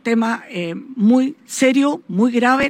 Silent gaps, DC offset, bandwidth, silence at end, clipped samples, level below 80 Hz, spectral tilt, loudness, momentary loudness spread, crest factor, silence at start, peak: none; under 0.1%; 15.5 kHz; 0 s; under 0.1%; -60 dBFS; -5 dB/octave; -18 LUFS; 10 LU; 16 dB; 0.05 s; -2 dBFS